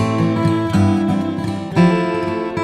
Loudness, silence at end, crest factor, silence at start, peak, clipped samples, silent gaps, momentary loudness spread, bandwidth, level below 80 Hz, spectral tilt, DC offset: -17 LUFS; 0 s; 14 dB; 0 s; -2 dBFS; under 0.1%; none; 6 LU; 11 kHz; -48 dBFS; -7.5 dB/octave; under 0.1%